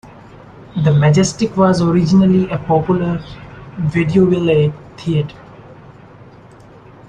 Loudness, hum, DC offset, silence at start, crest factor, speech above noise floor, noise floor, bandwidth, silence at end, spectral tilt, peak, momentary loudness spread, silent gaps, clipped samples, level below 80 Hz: -15 LUFS; none; under 0.1%; 0.05 s; 14 dB; 27 dB; -41 dBFS; 9.6 kHz; 1.35 s; -7 dB/octave; -2 dBFS; 15 LU; none; under 0.1%; -44 dBFS